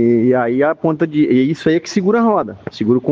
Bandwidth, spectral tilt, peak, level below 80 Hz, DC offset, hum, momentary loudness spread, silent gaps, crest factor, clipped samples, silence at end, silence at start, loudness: 7.6 kHz; -7 dB/octave; -2 dBFS; -54 dBFS; under 0.1%; none; 4 LU; none; 14 dB; under 0.1%; 0 s; 0 s; -15 LUFS